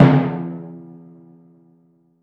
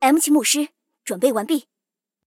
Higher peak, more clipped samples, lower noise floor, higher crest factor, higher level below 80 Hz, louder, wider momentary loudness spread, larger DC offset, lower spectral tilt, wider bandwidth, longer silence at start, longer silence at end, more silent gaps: first, 0 dBFS vs -4 dBFS; neither; second, -57 dBFS vs -85 dBFS; about the same, 20 dB vs 16 dB; first, -54 dBFS vs -72 dBFS; about the same, -20 LUFS vs -20 LUFS; first, 26 LU vs 14 LU; neither; first, -10 dB/octave vs -2 dB/octave; second, 5.2 kHz vs 17 kHz; about the same, 0 s vs 0 s; first, 1.4 s vs 0.75 s; neither